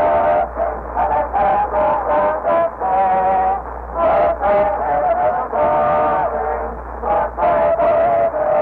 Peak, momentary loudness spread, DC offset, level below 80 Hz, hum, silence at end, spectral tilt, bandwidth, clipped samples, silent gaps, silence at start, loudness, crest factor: -8 dBFS; 6 LU; under 0.1%; -36 dBFS; none; 0 s; -8.5 dB/octave; 4.3 kHz; under 0.1%; none; 0 s; -17 LUFS; 10 dB